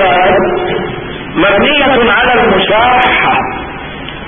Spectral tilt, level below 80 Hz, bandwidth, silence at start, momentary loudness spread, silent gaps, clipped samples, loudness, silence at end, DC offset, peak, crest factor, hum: -8 dB/octave; -32 dBFS; 3.7 kHz; 0 s; 13 LU; none; under 0.1%; -9 LUFS; 0 s; 1%; 0 dBFS; 10 dB; none